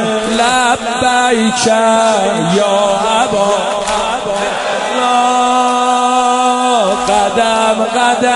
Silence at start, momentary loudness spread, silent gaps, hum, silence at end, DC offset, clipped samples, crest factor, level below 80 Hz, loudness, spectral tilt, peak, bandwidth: 0 s; 4 LU; none; none; 0 s; under 0.1%; under 0.1%; 12 dB; -44 dBFS; -12 LUFS; -3 dB/octave; 0 dBFS; 11.5 kHz